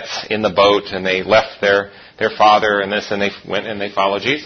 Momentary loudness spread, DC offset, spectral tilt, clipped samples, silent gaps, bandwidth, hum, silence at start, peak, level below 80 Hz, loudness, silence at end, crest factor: 10 LU; under 0.1%; -4 dB/octave; under 0.1%; none; 6.6 kHz; none; 0 s; 0 dBFS; -52 dBFS; -16 LUFS; 0 s; 16 dB